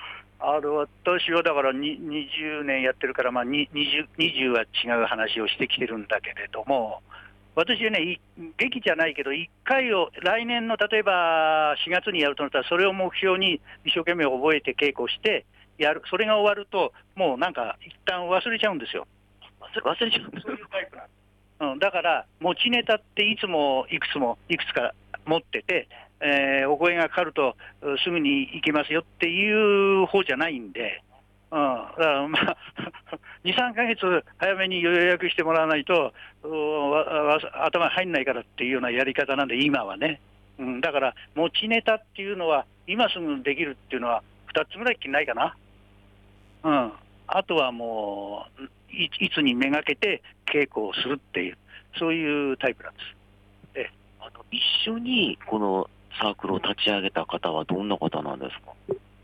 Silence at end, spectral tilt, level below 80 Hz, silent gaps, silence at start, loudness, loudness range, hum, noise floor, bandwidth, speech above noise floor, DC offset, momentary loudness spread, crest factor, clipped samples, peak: 0.25 s; -5.5 dB/octave; -62 dBFS; none; 0 s; -25 LUFS; 5 LU; 50 Hz at -60 dBFS; -54 dBFS; 10.5 kHz; 29 dB; under 0.1%; 11 LU; 16 dB; under 0.1%; -10 dBFS